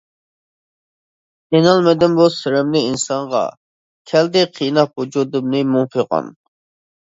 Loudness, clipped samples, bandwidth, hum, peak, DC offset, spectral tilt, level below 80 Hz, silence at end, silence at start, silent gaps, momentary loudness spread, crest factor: -16 LUFS; under 0.1%; 8 kHz; none; 0 dBFS; under 0.1%; -5.5 dB/octave; -58 dBFS; 0.9 s; 1.5 s; 3.57-4.05 s; 8 LU; 18 dB